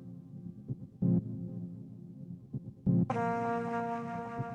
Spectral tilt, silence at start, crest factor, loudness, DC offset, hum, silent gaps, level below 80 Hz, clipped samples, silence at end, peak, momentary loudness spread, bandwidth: -9.5 dB/octave; 0 s; 18 dB; -35 LUFS; under 0.1%; none; none; -62 dBFS; under 0.1%; 0 s; -18 dBFS; 17 LU; 7.2 kHz